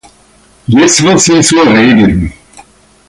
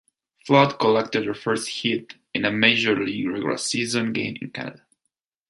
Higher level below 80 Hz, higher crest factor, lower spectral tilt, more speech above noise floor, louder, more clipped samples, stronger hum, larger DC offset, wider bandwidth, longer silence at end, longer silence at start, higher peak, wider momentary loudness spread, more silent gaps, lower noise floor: first, -30 dBFS vs -64 dBFS; second, 8 dB vs 22 dB; about the same, -4 dB/octave vs -4 dB/octave; second, 38 dB vs 57 dB; first, -6 LUFS vs -22 LUFS; neither; neither; neither; about the same, 11.5 kHz vs 11.5 kHz; about the same, 0.75 s vs 0.75 s; first, 0.7 s vs 0.45 s; about the same, 0 dBFS vs -2 dBFS; second, 10 LU vs 14 LU; neither; second, -44 dBFS vs -79 dBFS